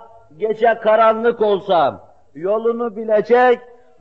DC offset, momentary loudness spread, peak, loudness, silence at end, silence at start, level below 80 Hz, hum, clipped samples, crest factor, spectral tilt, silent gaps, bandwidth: 0.3%; 10 LU; -2 dBFS; -17 LUFS; 0.4 s; 0.4 s; -64 dBFS; none; under 0.1%; 14 dB; -3 dB/octave; none; 6 kHz